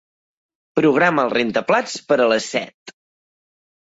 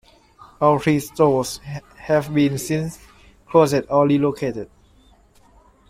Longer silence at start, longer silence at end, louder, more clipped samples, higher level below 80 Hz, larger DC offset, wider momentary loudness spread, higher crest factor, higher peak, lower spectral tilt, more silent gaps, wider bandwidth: first, 0.75 s vs 0.6 s; second, 1.05 s vs 1.25 s; about the same, -18 LUFS vs -19 LUFS; neither; second, -64 dBFS vs -52 dBFS; neither; second, 10 LU vs 15 LU; about the same, 16 dB vs 18 dB; about the same, -4 dBFS vs -2 dBFS; second, -4.5 dB/octave vs -6.5 dB/octave; first, 2.74-2.86 s vs none; second, 8 kHz vs 16 kHz